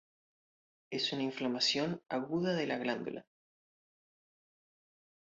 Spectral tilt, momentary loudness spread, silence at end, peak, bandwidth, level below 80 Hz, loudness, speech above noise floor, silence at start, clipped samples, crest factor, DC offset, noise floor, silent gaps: -3 dB/octave; 10 LU; 2 s; -18 dBFS; 7.6 kHz; -78 dBFS; -35 LUFS; over 55 dB; 0.9 s; under 0.1%; 20 dB; under 0.1%; under -90 dBFS; none